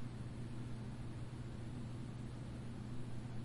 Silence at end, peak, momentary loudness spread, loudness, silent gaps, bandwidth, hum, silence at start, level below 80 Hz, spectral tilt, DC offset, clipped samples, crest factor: 0 s; -34 dBFS; 1 LU; -48 LUFS; none; 11.5 kHz; none; 0 s; -58 dBFS; -7 dB/octave; under 0.1%; under 0.1%; 12 dB